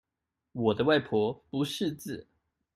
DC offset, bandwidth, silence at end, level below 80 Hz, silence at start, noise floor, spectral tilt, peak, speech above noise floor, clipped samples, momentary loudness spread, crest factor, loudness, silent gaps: under 0.1%; 15 kHz; 0.55 s; -66 dBFS; 0.55 s; -87 dBFS; -5.5 dB/octave; -12 dBFS; 58 dB; under 0.1%; 16 LU; 20 dB; -29 LUFS; none